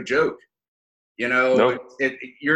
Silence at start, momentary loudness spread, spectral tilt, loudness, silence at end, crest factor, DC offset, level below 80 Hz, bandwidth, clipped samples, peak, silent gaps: 0 s; 9 LU; -5 dB/octave; -22 LUFS; 0 s; 18 dB; under 0.1%; -64 dBFS; 9.4 kHz; under 0.1%; -6 dBFS; 0.68-1.15 s